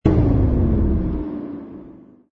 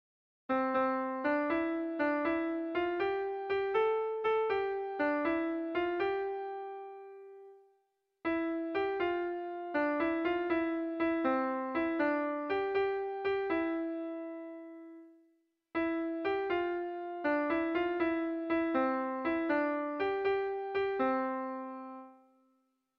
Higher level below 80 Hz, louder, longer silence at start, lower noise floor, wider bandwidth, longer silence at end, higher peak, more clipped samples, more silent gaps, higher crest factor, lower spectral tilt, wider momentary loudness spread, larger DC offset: first, -24 dBFS vs -68 dBFS; first, -20 LUFS vs -33 LUFS; second, 0.05 s vs 0.5 s; second, -43 dBFS vs -78 dBFS; second, 4.4 kHz vs 5.6 kHz; second, 0.35 s vs 0.85 s; first, -2 dBFS vs -20 dBFS; neither; neither; about the same, 18 dB vs 14 dB; first, -11.5 dB/octave vs -2.5 dB/octave; first, 18 LU vs 11 LU; neither